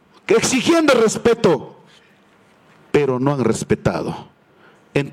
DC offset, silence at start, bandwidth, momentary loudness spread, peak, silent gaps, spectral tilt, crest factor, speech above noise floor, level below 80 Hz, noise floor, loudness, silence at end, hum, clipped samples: under 0.1%; 0.3 s; 16 kHz; 10 LU; -2 dBFS; none; -5 dB/octave; 16 dB; 36 dB; -50 dBFS; -53 dBFS; -17 LUFS; 0 s; none; under 0.1%